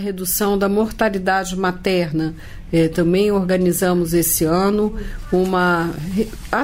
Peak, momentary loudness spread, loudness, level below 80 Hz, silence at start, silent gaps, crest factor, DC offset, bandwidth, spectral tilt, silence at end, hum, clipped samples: -4 dBFS; 7 LU; -18 LUFS; -36 dBFS; 0 s; none; 14 dB; under 0.1%; 16.5 kHz; -5 dB/octave; 0 s; none; under 0.1%